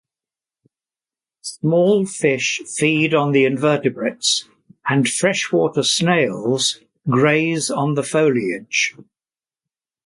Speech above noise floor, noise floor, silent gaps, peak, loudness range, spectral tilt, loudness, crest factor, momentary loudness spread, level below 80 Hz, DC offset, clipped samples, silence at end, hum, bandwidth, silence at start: over 72 dB; under -90 dBFS; none; -2 dBFS; 2 LU; -4 dB/octave; -18 LUFS; 16 dB; 6 LU; -64 dBFS; under 0.1%; under 0.1%; 1.05 s; none; 11.5 kHz; 1.45 s